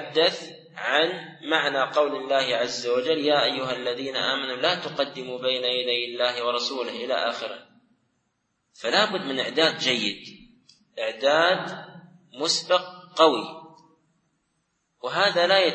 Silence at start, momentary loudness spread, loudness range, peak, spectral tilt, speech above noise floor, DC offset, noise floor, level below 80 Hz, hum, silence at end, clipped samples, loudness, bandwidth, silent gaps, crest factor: 0 s; 13 LU; 3 LU; -4 dBFS; -2.5 dB/octave; 50 dB; under 0.1%; -74 dBFS; -74 dBFS; none; 0 s; under 0.1%; -24 LUFS; 8.8 kHz; none; 22 dB